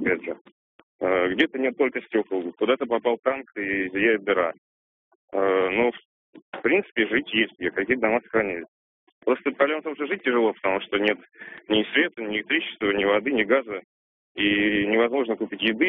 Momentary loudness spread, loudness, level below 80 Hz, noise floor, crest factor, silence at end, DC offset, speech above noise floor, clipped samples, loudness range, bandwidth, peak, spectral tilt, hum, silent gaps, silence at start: 8 LU; -24 LUFS; -62 dBFS; under -90 dBFS; 18 dB; 0 s; under 0.1%; over 66 dB; under 0.1%; 2 LU; 4 kHz; -6 dBFS; -2 dB/octave; none; 0.41-0.45 s, 0.52-0.99 s, 3.19-3.23 s, 4.58-5.28 s, 6.05-6.33 s, 6.42-6.52 s, 8.68-9.21 s, 13.84-14.35 s; 0 s